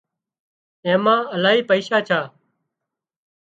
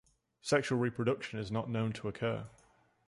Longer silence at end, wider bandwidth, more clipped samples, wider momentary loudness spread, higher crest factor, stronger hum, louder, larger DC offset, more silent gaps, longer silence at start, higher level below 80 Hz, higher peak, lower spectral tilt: first, 1.15 s vs 0.6 s; second, 7.8 kHz vs 11.5 kHz; neither; about the same, 8 LU vs 10 LU; about the same, 18 dB vs 20 dB; neither; first, -19 LUFS vs -35 LUFS; neither; neither; first, 0.85 s vs 0.45 s; second, -72 dBFS vs -66 dBFS; first, -2 dBFS vs -16 dBFS; about the same, -5.5 dB/octave vs -6 dB/octave